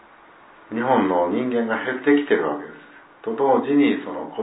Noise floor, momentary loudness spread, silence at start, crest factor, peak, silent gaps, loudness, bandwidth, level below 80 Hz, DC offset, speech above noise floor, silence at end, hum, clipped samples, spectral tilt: -49 dBFS; 13 LU; 0.7 s; 18 dB; -4 dBFS; none; -21 LUFS; 4 kHz; -70 dBFS; under 0.1%; 28 dB; 0 s; none; under 0.1%; -10 dB/octave